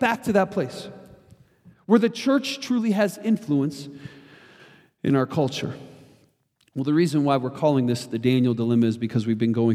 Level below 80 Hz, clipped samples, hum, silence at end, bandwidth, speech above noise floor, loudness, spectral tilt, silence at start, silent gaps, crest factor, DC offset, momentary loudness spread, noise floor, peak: -66 dBFS; under 0.1%; none; 0 s; 15 kHz; 43 dB; -23 LUFS; -6.5 dB/octave; 0 s; none; 18 dB; under 0.1%; 17 LU; -65 dBFS; -6 dBFS